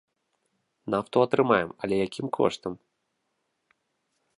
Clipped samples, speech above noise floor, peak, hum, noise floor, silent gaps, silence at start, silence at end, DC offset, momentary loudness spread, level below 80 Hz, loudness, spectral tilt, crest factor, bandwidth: under 0.1%; 52 dB; -6 dBFS; none; -78 dBFS; none; 0.85 s; 1.6 s; under 0.1%; 15 LU; -64 dBFS; -26 LUFS; -6 dB/octave; 22 dB; 11 kHz